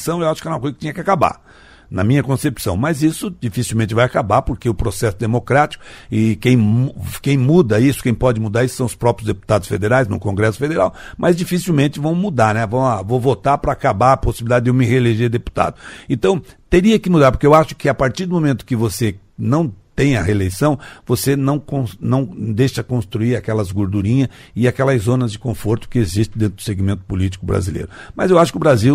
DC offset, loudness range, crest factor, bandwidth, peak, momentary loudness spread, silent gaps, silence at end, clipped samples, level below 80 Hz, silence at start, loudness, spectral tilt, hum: under 0.1%; 4 LU; 16 dB; 16 kHz; 0 dBFS; 9 LU; none; 0 s; under 0.1%; -36 dBFS; 0 s; -17 LUFS; -6.5 dB/octave; none